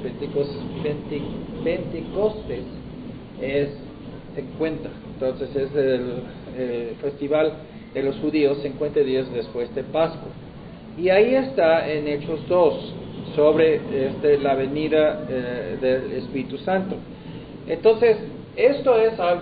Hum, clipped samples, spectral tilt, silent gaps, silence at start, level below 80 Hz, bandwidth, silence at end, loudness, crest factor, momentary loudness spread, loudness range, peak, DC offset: none; under 0.1%; -11 dB/octave; none; 0 s; -48 dBFS; 4.9 kHz; 0 s; -23 LUFS; 18 dB; 17 LU; 7 LU; -4 dBFS; under 0.1%